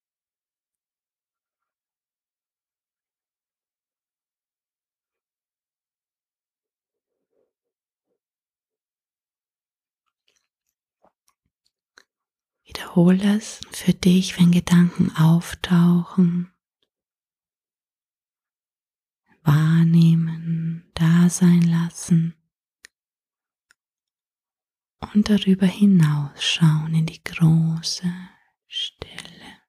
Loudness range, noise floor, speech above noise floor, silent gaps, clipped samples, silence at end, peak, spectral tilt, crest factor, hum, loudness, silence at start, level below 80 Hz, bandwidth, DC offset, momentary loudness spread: 9 LU; under -90 dBFS; over 72 dB; 18.08-18.12 s; under 0.1%; 0.2 s; -4 dBFS; -6.5 dB/octave; 18 dB; none; -19 LUFS; 12.75 s; -54 dBFS; 13.5 kHz; under 0.1%; 14 LU